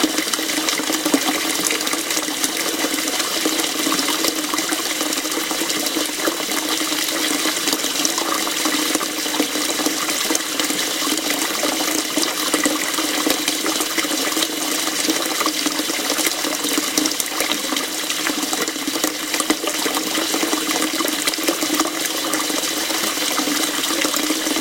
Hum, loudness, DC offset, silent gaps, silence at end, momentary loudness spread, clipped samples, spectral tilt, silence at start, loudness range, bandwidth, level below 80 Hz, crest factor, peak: none; -19 LUFS; under 0.1%; none; 0 s; 2 LU; under 0.1%; -0.5 dB/octave; 0 s; 1 LU; 17.5 kHz; -62 dBFS; 20 dB; 0 dBFS